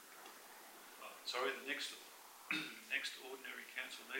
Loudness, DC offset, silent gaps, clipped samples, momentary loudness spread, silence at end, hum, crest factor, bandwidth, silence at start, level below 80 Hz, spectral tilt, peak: -44 LUFS; under 0.1%; none; under 0.1%; 15 LU; 0 s; none; 22 dB; 16 kHz; 0 s; under -90 dBFS; -1 dB/octave; -26 dBFS